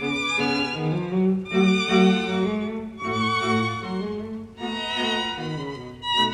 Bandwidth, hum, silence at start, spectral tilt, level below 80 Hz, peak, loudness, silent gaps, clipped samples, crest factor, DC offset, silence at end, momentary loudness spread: 10.5 kHz; none; 0 s; -5.5 dB/octave; -54 dBFS; -6 dBFS; -24 LUFS; none; under 0.1%; 18 dB; under 0.1%; 0 s; 12 LU